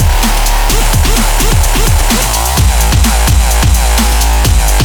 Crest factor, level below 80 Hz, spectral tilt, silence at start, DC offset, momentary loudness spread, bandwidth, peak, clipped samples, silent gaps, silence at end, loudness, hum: 8 dB; -10 dBFS; -3.5 dB/octave; 0 s; under 0.1%; 2 LU; over 20 kHz; 0 dBFS; under 0.1%; none; 0 s; -10 LUFS; none